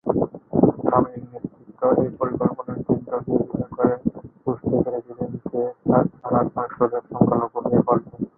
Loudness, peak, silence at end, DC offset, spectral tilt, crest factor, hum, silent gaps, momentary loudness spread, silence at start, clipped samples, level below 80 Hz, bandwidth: -23 LUFS; -2 dBFS; 0.1 s; under 0.1%; -15 dB/octave; 20 dB; none; none; 10 LU; 0.05 s; under 0.1%; -50 dBFS; 2.4 kHz